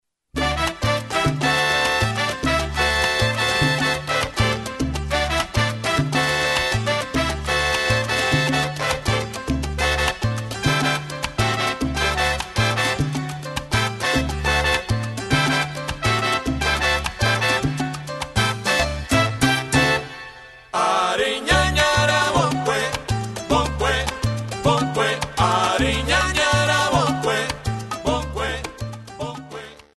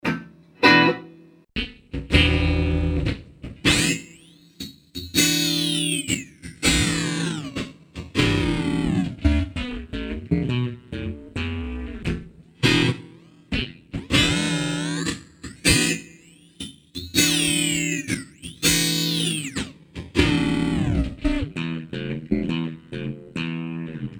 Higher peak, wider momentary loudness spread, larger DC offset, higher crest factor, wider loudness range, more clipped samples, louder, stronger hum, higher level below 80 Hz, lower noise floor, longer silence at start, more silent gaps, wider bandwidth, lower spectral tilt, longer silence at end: about the same, -2 dBFS vs 0 dBFS; second, 8 LU vs 16 LU; neither; second, 18 dB vs 24 dB; about the same, 2 LU vs 4 LU; neither; about the same, -20 LUFS vs -22 LUFS; neither; about the same, -34 dBFS vs -34 dBFS; second, -41 dBFS vs -50 dBFS; first, 0.35 s vs 0.05 s; neither; second, 13 kHz vs over 20 kHz; about the same, -4 dB/octave vs -3.5 dB/octave; first, 0.2 s vs 0 s